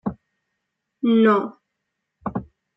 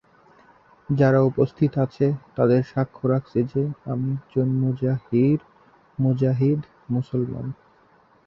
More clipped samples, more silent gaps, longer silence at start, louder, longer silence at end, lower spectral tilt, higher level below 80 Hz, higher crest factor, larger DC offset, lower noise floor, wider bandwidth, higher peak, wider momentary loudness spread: neither; neither; second, 0.05 s vs 0.9 s; first, -20 LUFS vs -23 LUFS; second, 0.35 s vs 0.75 s; second, -9 dB/octave vs -10.5 dB/octave; about the same, -56 dBFS vs -56 dBFS; about the same, 18 dB vs 18 dB; neither; first, -79 dBFS vs -57 dBFS; about the same, 5.6 kHz vs 6 kHz; about the same, -6 dBFS vs -6 dBFS; first, 18 LU vs 8 LU